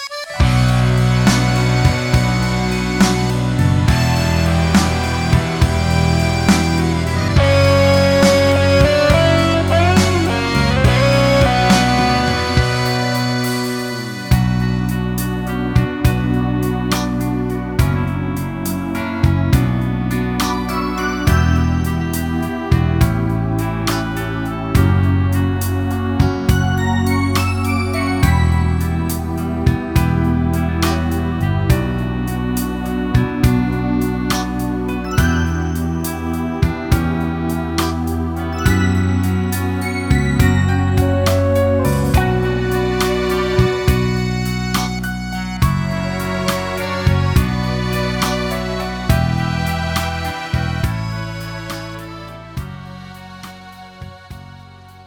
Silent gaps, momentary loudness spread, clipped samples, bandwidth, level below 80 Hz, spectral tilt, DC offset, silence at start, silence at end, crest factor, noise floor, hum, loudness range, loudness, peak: none; 9 LU; under 0.1%; 19.5 kHz; -26 dBFS; -6 dB/octave; under 0.1%; 0 s; 0.05 s; 16 dB; -39 dBFS; none; 6 LU; -17 LUFS; 0 dBFS